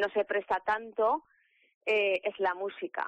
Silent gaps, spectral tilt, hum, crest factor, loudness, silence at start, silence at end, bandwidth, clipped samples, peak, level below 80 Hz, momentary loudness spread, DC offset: 1.74-1.81 s; -4.5 dB/octave; none; 12 dB; -31 LUFS; 0 s; 0 s; 8.4 kHz; under 0.1%; -18 dBFS; -70 dBFS; 8 LU; under 0.1%